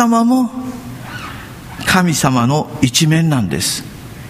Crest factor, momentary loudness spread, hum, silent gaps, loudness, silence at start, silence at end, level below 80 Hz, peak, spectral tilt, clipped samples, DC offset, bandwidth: 16 dB; 17 LU; none; none; -14 LUFS; 0 s; 0 s; -42 dBFS; 0 dBFS; -4.5 dB/octave; under 0.1%; under 0.1%; 15.5 kHz